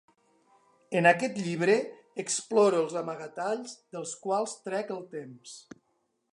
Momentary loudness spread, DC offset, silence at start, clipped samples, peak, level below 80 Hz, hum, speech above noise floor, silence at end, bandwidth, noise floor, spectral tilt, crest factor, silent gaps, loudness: 18 LU; under 0.1%; 0.9 s; under 0.1%; -8 dBFS; -82 dBFS; none; 47 dB; 0.7 s; 11.5 kHz; -76 dBFS; -4 dB/octave; 22 dB; none; -29 LUFS